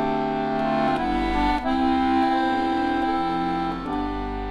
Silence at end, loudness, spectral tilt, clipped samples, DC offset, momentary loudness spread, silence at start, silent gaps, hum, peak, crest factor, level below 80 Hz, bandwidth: 0 s; -23 LUFS; -6.5 dB/octave; under 0.1%; under 0.1%; 7 LU; 0 s; none; none; -10 dBFS; 12 dB; -38 dBFS; 10.5 kHz